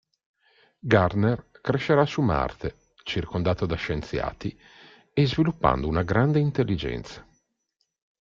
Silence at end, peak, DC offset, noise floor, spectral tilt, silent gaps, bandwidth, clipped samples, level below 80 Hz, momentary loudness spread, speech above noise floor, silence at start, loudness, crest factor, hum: 1 s; -4 dBFS; under 0.1%; -77 dBFS; -7.5 dB/octave; none; 7.4 kHz; under 0.1%; -44 dBFS; 14 LU; 52 dB; 0.85 s; -25 LUFS; 22 dB; none